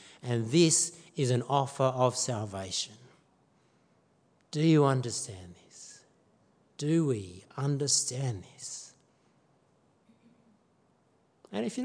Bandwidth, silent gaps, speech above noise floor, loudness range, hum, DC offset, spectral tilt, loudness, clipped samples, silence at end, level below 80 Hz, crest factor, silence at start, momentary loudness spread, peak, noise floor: 10.5 kHz; none; 40 dB; 8 LU; none; under 0.1%; -4.5 dB/octave; -29 LUFS; under 0.1%; 0 s; -76 dBFS; 20 dB; 0.05 s; 20 LU; -12 dBFS; -69 dBFS